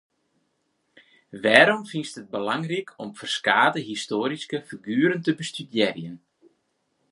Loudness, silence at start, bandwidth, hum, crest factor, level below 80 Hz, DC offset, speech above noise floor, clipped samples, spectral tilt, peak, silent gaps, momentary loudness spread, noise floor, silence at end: -23 LUFS; 1.35 s; 11.5 kHz; none; 26 dB; -72 dBFS; under 0.1%; 49 dB; under 0.1%; -4.5 dB/octave; 0 dBFS; none; 16 LU; -73 dBFS; 0.95 s